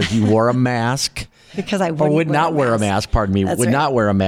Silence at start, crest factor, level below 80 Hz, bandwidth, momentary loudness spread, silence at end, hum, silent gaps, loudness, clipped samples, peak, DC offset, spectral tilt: 0 s; 12 dB; -34 dBFS; 16 kHz; 8 LU; 0 s; none; none; -17 LUFS; under 0.1%; -6 dBFS; under 0.1%; -5.5 dB/octave